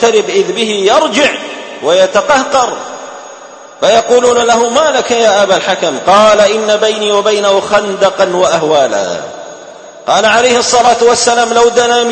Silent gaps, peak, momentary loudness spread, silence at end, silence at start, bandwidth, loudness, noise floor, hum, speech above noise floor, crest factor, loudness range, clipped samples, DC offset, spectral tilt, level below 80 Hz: none; 0 dBFS; 14 LU; 0 s; 0 s; 8.8 kHz; -9 LUFS; -32 dBFS; none; 23 dB; 10 dB; 3 LU; 0.2%; under 0.1%; -2 dB/octave; -48 dBFS